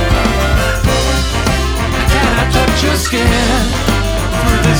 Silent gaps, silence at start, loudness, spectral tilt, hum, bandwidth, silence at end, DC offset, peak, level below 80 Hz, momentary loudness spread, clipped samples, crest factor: none; 0 s; -13 LUFS; -4.5 dB/octave; none; 19 kHz; 0 s; under 0.1%; 0 dBFS; -16 dBFS; 3 LU; under 0.1%; 12 dB